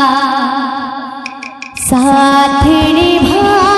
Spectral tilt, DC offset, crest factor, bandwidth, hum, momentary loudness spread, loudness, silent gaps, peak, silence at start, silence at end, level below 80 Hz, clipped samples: -4 dB/octave; under 0.1%; 10 dB; 13.5 kHz; none; 15 LU; -10 LUFS; none; 0 dBFS; 0 s; 0 s; -30 dBFS; under 0.1%